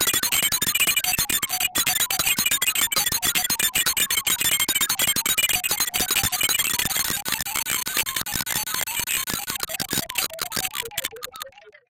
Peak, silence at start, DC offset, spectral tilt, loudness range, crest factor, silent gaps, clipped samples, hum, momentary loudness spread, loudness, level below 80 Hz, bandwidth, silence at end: -8 dBFS; 0 s; under 0.1%; 0.5 dB/octave; 5 LU; 16 dB; none; under 0.1%; none; 7 LU; -21 LUFS; -50 dBFS; 17.5 kHz; 0.2 s